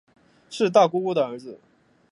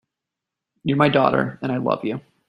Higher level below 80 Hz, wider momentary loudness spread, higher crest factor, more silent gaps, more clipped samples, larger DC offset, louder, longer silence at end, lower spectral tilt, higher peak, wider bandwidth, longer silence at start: second, -74 dBFS vs -58 dBFS; first, 20 LU vs 11 LU; about the same, 22 dB vs 20 dB; neither; neither; neither; about the same, -22 LUFS vs -21 LUFS; first, 0.55 s vs 0.3 s; second, -5.5 dB/octave vs -8.5 dB/octave; about the same, -4 dBFS vs -2 dBFS; about the same, 11.5 kHz vs 11 kHz; second, 0.5 s vs 0.85 s